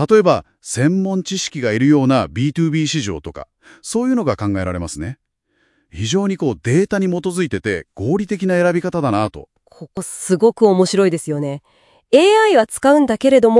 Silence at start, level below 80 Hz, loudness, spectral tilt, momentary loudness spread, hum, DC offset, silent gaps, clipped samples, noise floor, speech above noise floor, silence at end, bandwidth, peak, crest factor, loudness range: 0 s; -50 dBFS; -17 LUFS; -5.5 dB/octave; 13 LU; none; under 0.1%; none; under 0.1%; -64 dBFS; 48 dB; 0 s; 12 kHz; 0 dBFS; 16 dB; 6 LU